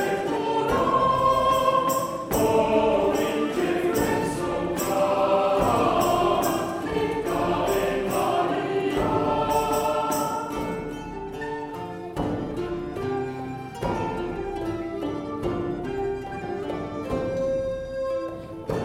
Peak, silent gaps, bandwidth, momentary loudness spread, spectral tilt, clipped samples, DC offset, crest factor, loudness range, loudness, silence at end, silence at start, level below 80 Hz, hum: -8 dBFS; none; 16.5 kHz; 11 LU; -5.5 dB/octave; under 0.1%; under 0.1%; 16 dB; 8 LU; -25 LUFS; 0 s; 0 s; -44 dBFS; none